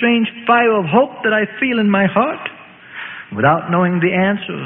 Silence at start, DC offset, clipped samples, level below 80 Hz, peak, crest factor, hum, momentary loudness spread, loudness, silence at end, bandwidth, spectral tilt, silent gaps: 0 s; under 0.1%; under 0.1%; -56 dBFS; 0 dBFS; 16 dB; none; 15 LU; -15 LUFS; 0 s; 3.9 kHz; -11.5 dB/octave; none